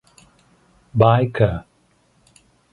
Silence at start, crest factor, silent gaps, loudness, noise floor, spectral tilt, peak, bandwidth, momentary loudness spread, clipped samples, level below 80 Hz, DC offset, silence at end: 0.95 s; 22 dB; none; -18 LUFS; -60 dBFS; -8.5 dB/octave; 0 dBFS; 11 kHz; 12 LU; under 0.1%; -44 dBFS; under 0.1%; 1.1 s